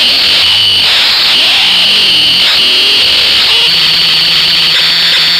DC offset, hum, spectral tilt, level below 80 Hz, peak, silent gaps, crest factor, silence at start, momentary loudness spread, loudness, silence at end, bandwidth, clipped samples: under 0.1%; none; 0 dB/octave; -42 dBFS; 0 dBFS; none; 8 dB; 0 s; 1 LU; -4 LUFS; 0 s; 16 kHz; under 0.1%